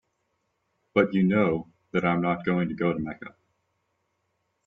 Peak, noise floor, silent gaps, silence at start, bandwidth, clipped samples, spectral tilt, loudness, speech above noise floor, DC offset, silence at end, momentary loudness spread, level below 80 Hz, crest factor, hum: -8 dBFS; -76 dBFS; none; 0.95 s; 4.5 kHz; under 0.1%; -9 dB/octave; -26 LUFS; 51 dB; under 0.1%; 1.35 s; 12 LU; -62 dBFS; 20 dB; none